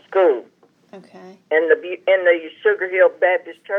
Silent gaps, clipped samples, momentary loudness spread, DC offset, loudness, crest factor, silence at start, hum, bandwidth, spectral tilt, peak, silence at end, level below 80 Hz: none; under 0.1%; 5 LU; under 0.1%; -18 LUFS; 18 dB; 0.1 s; none; 3.9 kHz; -5.5 dB/octave; -2 dBFS; 0 s; under -90 dBFS